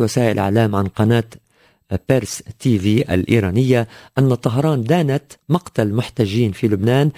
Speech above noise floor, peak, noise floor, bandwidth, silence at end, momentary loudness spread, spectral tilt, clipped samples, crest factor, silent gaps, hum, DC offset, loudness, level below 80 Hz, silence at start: 39 dB; 0 dBFS; -55 dBFS; 16 kHz; 0.05 s; 6 LU; -7 dB/octave; under 0.1%; 16 dB; none; none; under 0.1%; -18 LUFS; -40 dBFS; 0 s